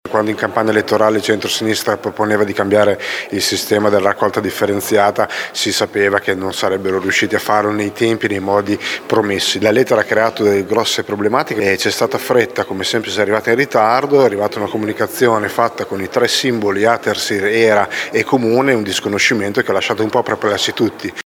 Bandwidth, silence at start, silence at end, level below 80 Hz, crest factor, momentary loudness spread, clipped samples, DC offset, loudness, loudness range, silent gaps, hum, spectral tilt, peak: 20 kHz; 0.05 s; 0.05 s; -58 dBFS; 14 dB; 5 LU; under 0.1%; under 0.1%; -15 LUFS; 1 LU; none; none; -4 dB/octave; 0 dBFS